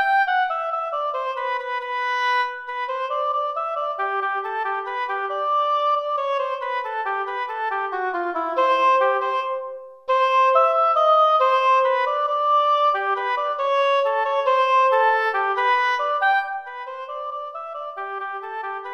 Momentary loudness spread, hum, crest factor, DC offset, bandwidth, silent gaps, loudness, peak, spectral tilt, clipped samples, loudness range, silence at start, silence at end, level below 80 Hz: 13 LU; none; 16 dB; under 0.1%; 7.6 kHz; none; -21 LUFS; -6 dBFS; -1 dB/octave; under 0.1%; 6 LU; 0 s; 0 s; -76 dBFS